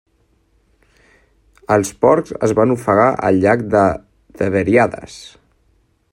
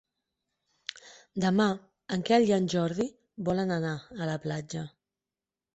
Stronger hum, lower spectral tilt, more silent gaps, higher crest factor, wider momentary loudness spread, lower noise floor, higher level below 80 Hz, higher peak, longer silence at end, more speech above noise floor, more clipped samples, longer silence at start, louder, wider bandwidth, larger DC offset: neither; about the same, -6.5 dB/octave vs -6 dB/octave; neither; about the same, 16 dB vs 20 dB; second, 12 LU vs 17 LU; second, -59 dBFS vs under -90 dBFS; first, -50 dBFS vs -66 dBFS; first, 0 dBFS vs -10 dBFS; about the same, 0.85 s vs 0.85 s; second, 44 dB vs over 62 dB; neither; first, 1.7 s vs 1.05 s; first, -15 LUFS vs -29 LUFS; first, 16 kHz vs 8.2 kHz; neither